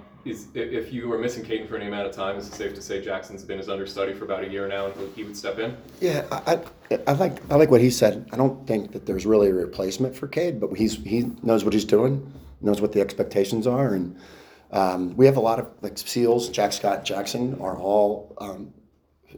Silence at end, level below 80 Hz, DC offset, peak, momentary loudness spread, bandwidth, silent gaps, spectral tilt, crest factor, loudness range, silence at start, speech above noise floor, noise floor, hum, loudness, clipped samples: 0 s; -52 dBFS; under 0.1%; -2 dBFS; 13 LU; over 20 kHz; none; -6 dB/octave; 22 dB; 9 LU; 0 s; 37 dB; -60 dBFS; none; -24 LUFS; under 0.1%